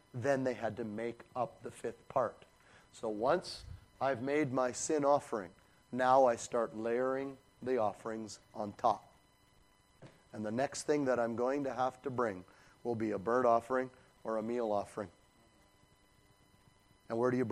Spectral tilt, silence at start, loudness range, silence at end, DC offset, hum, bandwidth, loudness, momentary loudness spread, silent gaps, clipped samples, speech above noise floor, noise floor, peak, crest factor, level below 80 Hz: -5 dB/octave; 0.15 s; 6 LU; 0 s; under 0.1%; none; 13 kHz; -35 LUFS; 14 LU; none; under 0.1%; 33 dB; -67 dBFS; -14 dBFS; 22 dB; -70 dBFS